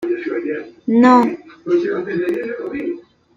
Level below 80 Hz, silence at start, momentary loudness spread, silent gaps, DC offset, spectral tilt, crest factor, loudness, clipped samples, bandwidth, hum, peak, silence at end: -62 dBFS; 0 s; 15 LU; none; under 0.1%; -7 dB/octave; 16 dB; -18 LUFS; under 0.1%; 7.6 kHz; none; -2 dBFS; 0.35 s